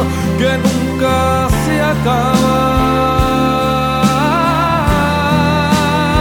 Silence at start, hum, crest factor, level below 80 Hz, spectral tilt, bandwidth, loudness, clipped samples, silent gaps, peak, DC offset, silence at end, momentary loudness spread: 0 s; none; 12 dB; -26 dBFS; -5.5 dB/octave; 19.5 kHz; -13 LUFS; under 0.1%; none; 0 dBFS; under 0.1%; 0 s; 2 LU